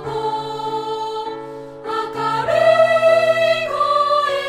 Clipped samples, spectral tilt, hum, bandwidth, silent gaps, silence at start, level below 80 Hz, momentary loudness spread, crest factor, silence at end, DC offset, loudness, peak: under 0.1%; -4 dB/octave; none; 12.5 kHz; none; 0 s; -56 dBFS; 14 LU; 14 dB; 0 s; under 0.1%; -17 LUFS; -4 dBFS